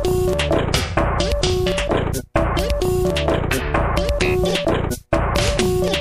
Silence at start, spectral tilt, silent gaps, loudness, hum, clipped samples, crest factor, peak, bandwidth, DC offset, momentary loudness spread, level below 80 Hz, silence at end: 0 s; -5 dB/octave; none; -20 LUFS; none; under 0.1%; 16 dB; -4 dBFS; 15.5 kHz; under 0.1%; 3 LU; -26 dBFS; 0 s